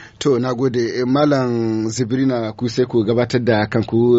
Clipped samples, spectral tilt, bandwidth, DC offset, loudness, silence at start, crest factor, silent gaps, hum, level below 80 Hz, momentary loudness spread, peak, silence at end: under 0.1%; -6 dB/octave; 8 kHz; under 0.1%; -18 LUFS; 0 s; 14 dB; none; none; -52 dBFS; 4 LU; -2 dBFS; 0 s